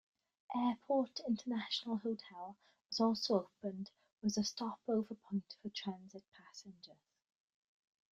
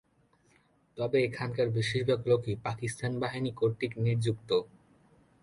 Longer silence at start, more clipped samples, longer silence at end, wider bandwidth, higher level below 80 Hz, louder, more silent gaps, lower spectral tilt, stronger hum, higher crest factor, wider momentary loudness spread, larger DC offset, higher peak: second, 0.5 s vs 0.95 s; neither; first, 1.25 s vs 0.75 s; second, 7.6 kHz vs 11.5 kHz; second, -82 dBFS vs -62 dBFS; second, -39 LUFS vs -31 LUFS; first, 4.12-4.17 s, 6.28-6.32 s vs none; second, -5 dB/octave vs -6.5 dB/octave; neither; about the same, 20 dB vs 18 dB; first, 19 LU vs 6 LU; neither; second, -20 dBFS vs -14 dBFS